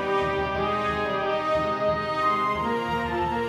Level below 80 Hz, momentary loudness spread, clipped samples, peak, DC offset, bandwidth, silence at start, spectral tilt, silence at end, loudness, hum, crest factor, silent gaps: -46 dBFS; 3 LU; under 0.1%; -12 dBFS; under 0.1%; 15.5 kHz; 0 s; -6 dB/octave; 0 s; -25 LUFS; none; 12 dB; none